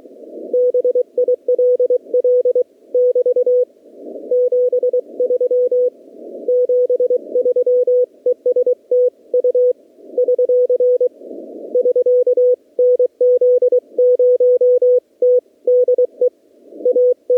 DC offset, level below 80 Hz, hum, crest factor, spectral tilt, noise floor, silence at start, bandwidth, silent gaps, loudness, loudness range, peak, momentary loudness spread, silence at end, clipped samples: under 0.1%; -84 dBFS; none; 8 dB; -7.5 dB/octave; -42 dBFS; 0.2 s; 1 kHz; none; -15 LUFS; 3 LU; -8 dBFS; 8 LU; 0 s; under 0.1%